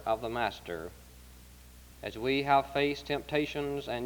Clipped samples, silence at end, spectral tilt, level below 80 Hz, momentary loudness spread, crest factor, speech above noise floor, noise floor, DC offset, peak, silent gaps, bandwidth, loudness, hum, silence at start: under 0.1%; 0 s; -5.5 dB/octave; -54 dBFS; 16 LU; 22 dB; 21 dB; -53 dBFS; under 0.1%; -10 dBFS; none; over 20 kHz; -32 LUFS; none; 0 s